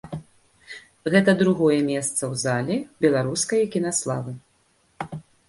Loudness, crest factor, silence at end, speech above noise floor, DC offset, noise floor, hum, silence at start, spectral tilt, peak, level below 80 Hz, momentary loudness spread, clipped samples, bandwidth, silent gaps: -22 LUFS; 20 dB; 0.3 s; 42 dB; under 0.1%; -64 dBFS; none; 0.05 s; -5 dB/octave; -4 dBFS; -60 dBFS; 19 LU; under 0.1%; 11.5 kHz; none